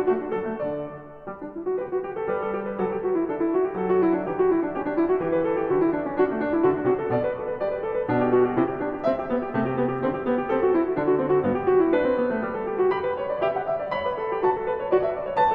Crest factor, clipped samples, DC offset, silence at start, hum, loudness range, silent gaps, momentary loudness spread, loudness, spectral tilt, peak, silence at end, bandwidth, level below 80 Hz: 14 dB; under 0.1%; under 0.1%; 0 s; none; 3 LU; none; 7 LU; -24 LUFS; -10 dB/octave; -10 dBFS; 0 s; 4.8 kHz; -54 dBFS